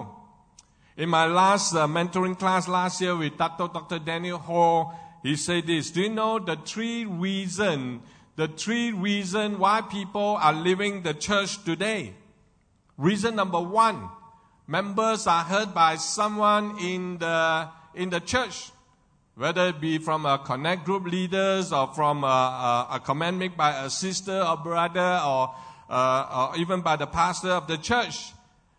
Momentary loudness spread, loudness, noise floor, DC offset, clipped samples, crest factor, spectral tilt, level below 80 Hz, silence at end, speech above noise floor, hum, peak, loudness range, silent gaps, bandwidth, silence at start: 9 LU; -25 LUFS; -63 dBFS; under 0.1%; under 0.1%; 18 dB; -4 dB/octave; -60 dBFS; 0.5 s; 38 dB; none; -8 dBFS; 3 LU; none; 9.6 kHz; 0 s